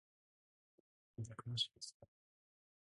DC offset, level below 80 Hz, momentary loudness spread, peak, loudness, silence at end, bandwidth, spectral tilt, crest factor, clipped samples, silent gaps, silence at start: under 0.1%; -78 dBFS; 13 LU; -28 dBFS; -45 LUFS; 0.9 s; 11 kHz; -3.5 dB/octave; 24 dB; under 0.1%; 1.94-2.00 s; 1.2 s